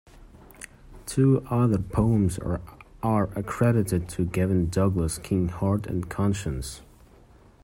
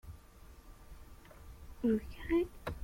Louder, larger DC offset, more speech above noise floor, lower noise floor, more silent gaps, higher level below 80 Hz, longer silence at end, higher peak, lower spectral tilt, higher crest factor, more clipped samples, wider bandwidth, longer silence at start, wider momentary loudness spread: first, -25 LUFS vs -36 LUFS; neither; first, 29 dB vs 21 dB; about the same, -53 dBFS vs -56 dBFS; neither; first, -44 dBFS vs -52 dBFS; first, 0.8 s vs 0 s; first, -10 dBFS vs -22 dBFS; about the same, -7 dB/octave vs -7.5 dB/octave; about the same, 16 dB vs 18 dB; neither; about the same, 16 kHz vs 16.5 kHz; first, 0.2 s vs 0.05 s; second, 14 LU vs 24 LU